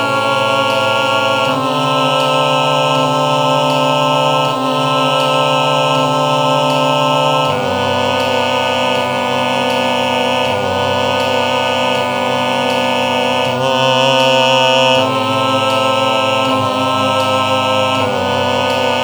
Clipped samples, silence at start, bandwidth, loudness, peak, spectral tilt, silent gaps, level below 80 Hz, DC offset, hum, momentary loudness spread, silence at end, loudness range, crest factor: under 0.1%; 0 s; over 20 kHz; -13 LUFS; 0 dBFS; -4 dB/octave; none; -60 dBFS; under 0.1%; none; 4 LU; 0 s; 2 LU; 14 dB